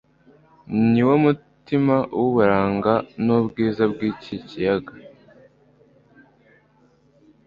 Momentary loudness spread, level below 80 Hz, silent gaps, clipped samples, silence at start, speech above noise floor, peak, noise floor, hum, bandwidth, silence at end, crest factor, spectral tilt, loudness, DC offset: 10 LU; -54 dBFS; none; under 0.1%; 0.7 s; 38 dB; -2 dBFS; -58 dBFS; none; 5.4 kHz; 2.45 s; 20 dB; -9.5 dB/octave; -20 LUFS; under 0.1%